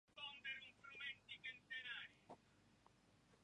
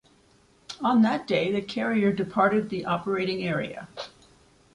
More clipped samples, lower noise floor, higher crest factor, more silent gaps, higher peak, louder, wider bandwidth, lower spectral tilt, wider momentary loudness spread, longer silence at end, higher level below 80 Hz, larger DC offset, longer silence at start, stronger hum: neither; first, -75 dBFS vs -60 dBFS; about the same, 18 dB vs 18 dB; neither; second, -40 dBFS vs -8 dBFS; second, -53 LUFS vs -25 LUFS; about the same, 10.5 kHz vs 10.5 kHz; second, -2 dB/octave vs -6.5 dB/octave; second, 14 LU vs 17 LU; second, 0 s vs 0.65 s; second, -86 dBFS vs -62 dBFS; neither; second, 0.1 s vs 0.7 s; first, 50 Hz at -85 dBFS vs none